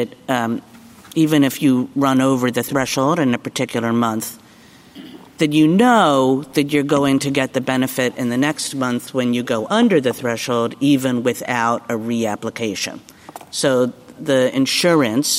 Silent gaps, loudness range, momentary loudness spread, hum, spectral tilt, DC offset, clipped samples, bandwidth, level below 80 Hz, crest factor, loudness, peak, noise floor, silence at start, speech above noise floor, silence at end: none; 4 LU; 9 LU; none; -4.5 dB/octave; under 0.1%; under 0.1%; 16 kHz; -60 dBFS; 16 dB; -18 LUFS; -2 dBFS; -46 dBFS; 0 s; 28 dB; 0 s